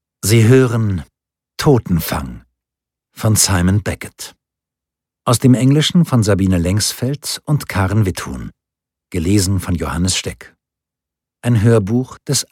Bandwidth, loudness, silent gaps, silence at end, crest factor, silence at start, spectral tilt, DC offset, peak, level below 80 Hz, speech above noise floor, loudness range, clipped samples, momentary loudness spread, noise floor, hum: 17.5 kHz; -15 LUFS; none; 0.05 s; 16 dB; 0.25 s; -5 dB/octave; under 0.1%; 0 dBFS; -38 dBFS; 70 dB; 4 LU; under 0.1%; 15 LU; -85 dBFS; none